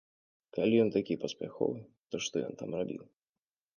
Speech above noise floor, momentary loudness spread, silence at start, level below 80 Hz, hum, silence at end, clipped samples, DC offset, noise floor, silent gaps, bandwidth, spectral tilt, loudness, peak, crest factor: over 57 dB; 15 LU; 0.55 s; -72 dBFS; none; 0.75 s; under 0.1%; under 0.1%; under -90 dBFS; 1.98-2.03 s; 10 kHz; -5.5 dB/octave; -33 LUFS; -16 dBFS; 20 dB